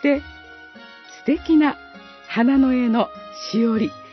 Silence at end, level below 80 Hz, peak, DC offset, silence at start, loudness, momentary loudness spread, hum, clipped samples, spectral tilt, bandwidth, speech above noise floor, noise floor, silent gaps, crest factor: 0.05 s; -50 dBFS; -4 dBFS; under 0.1%; 0 s; -20 LUFS; 24 LU; none; under 0.1%; -6 dB/octave; 6.2 kHz; 24 dB; -43 dBFS; none; 16 dB